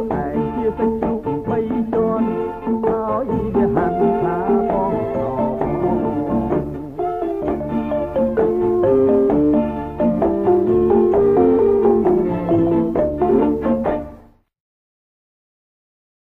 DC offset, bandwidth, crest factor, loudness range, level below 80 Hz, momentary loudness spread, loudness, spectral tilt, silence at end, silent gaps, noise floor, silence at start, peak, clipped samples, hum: under 0.1%; 4 kHz; 14 dB; 5 LU; -38 dBFS; 8 LU; -18 LUFS; -10.5 dB/octave; 2.1 s; none; -44 dBFS; 0 s; -4 dBFS; under 0.1%; none